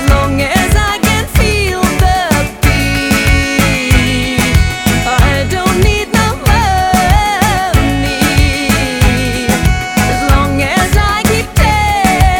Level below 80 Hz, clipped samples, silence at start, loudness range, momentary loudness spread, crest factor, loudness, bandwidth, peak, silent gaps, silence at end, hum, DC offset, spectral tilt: -16 dBFS; under 0.1%; 0 s; 1 LU; 2 LU; 10 dB; -11 LUFS; over 20 kHz; 0 dBFS; none; 0 s; none; under 0.1%; -4.5 dB/octave